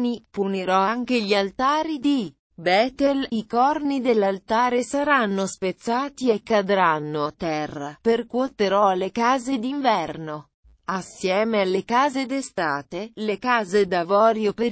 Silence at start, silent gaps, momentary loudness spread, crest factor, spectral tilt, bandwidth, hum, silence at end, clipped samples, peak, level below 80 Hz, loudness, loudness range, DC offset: 0 s; 2.39-2.50 s, 10.54-10.63 s; 8 LU; 16 dB; -5 dB/octave; 8 kHz; none; 0 s; under 0.1%; -6 dBFS; -58 dBFS; -22 LUFS; 2 LU; under 0.1%